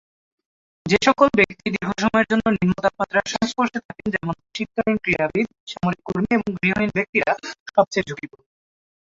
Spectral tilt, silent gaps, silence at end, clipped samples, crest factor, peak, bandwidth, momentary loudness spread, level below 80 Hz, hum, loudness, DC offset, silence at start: -5.5 dB/octave; 3.85-3.89 s, 5.60-5.67 s, 7.09-7.13 s, 7.60-7.66 s; 0.9 s; under 0.1%; 20 dB; -2 dBFS; 7.8 kHz; 10 LU; -50 dBFS; none; -21 LUFS; under 0.1%; 0.85 s